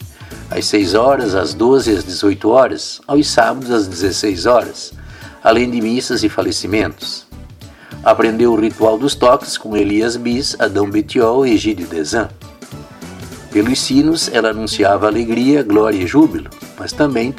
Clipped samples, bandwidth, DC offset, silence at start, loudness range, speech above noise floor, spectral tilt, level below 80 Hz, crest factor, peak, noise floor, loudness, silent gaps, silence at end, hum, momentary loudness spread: under 0.1%; 15.5 kHz; under 0.1%; 0 s; 3 LU; 22 dB; -4.5 dB/octave; -40 dBFS; 14 dB; 0 dBFS; -36 dBFS; -14 LUFS; none; 0 s; none; 16 LU